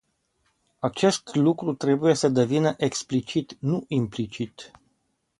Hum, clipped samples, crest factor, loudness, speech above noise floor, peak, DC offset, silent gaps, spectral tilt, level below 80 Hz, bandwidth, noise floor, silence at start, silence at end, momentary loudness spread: none; under 0.1%; 18 dB; -25 LUFS; 49 dB; -6 dBFS; under 0.1%; none; -5.5 dB/octave; -62 dBFS; 11.5 kHz; -73 dBFS; 0.85 s; 0.75 s; 10 LU